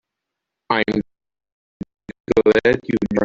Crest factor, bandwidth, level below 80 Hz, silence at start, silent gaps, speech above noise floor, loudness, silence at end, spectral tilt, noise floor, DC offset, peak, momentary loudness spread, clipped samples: 18 dB; 7.6 kHz; -48 dBFS; 0.7 s; 1.52-1.80 s, 2.20-2.24 s; 65 dB; -18 LUFS; 0 s; -6.5 dB/octave; -82 dBFS; under 0.1%; -2 dBFS; 22 LU; under 0.1%